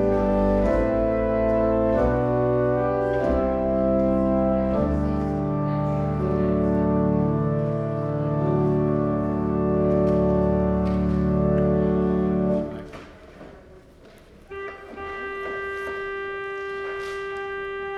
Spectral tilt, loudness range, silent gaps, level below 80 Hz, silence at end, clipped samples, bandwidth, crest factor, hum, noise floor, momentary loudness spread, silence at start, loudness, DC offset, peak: -9.5 dB/octave; 10 LU; none; -36 dBFS; 0 s; under 0.1%; 6.8 kHz; 14 dB; none; -49 dBFS; 10 LU; 0 s; -23 LUFS; under 0.1%; -10 dBFS